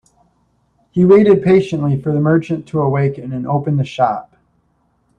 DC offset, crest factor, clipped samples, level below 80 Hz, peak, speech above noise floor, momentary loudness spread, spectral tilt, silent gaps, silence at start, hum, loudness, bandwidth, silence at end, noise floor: under 0.1%; 16 dB; under 0.1%; -50 dBFS; 0 dBFS; 47 dB; 11 LU; -9 dB/octave; none; 0.95 s; none; -15 LUFS; 8.6 kHz; 1 s; -61 dBFS